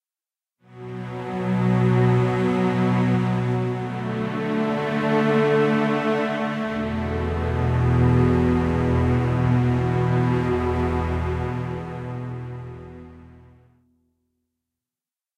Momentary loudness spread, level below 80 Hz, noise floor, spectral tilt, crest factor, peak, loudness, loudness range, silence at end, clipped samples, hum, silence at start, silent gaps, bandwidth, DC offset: 13 LU; -38 dBFS; under -90 dBFS; -8.5 dB/octave; 14 dB; -8 dBFS; -22 LUFS; 11 LU; 2 s; under 0.1%; none; 0.7 s; none; 8.8 kHz; under 0.1%